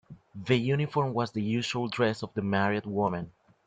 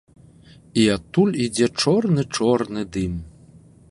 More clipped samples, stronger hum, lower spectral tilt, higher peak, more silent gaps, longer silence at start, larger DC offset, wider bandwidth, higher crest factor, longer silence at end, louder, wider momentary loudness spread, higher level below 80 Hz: neither; neither; about the same, -6.5 dB/octave vs -5.5 dB/octave; second, -10 dBFS vs -4 dBFS; neither; second, 0.1 s vs 0.75 s; neither; second, 9.2 kHz vs 11.5 kHz; about the same, 18 dB vs 18 dB; second, 0.35 s vs 0.6 s; second, -29 LUFS vs -21 LUFS; about the same, 10 LU vs 8 LU; second, -64 dBFS vs -46 dBFS